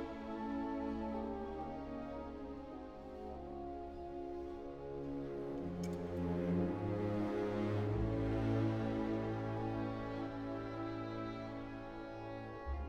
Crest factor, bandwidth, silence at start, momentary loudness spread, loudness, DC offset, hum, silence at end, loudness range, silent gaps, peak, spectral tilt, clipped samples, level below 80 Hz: 16 dB; 8.6 kHz; 0 s; 10 LU; -42 LUFS; under 0.1%; none; 0 s; 9 LU; none; -24 dBFS; -8.5 dB/octave; under 0.1%; -54 dBFS